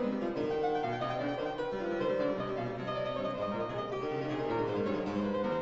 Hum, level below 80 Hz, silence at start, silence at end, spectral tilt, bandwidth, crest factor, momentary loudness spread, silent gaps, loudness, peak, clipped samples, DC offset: none; -60 dBFS; 0 s; 0 s; -5 dB/octave; 7.6 kHz; 12 dB; 4 LU; none; -34 LUFS; -22 dBFS; under 0.1%; under 0.1%